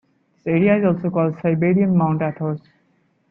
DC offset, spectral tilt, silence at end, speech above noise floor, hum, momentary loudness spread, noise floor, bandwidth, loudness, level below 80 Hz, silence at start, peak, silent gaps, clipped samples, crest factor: under 0.1%; -12 dB/octave; 0.7 s; 45 dB; none; 10 LU; -63 dBFS; 3.5 kHz; -19 LUFS; -58 dBFS; 0.45 s; -4 dBFS; none; under 0.1%; 14 dB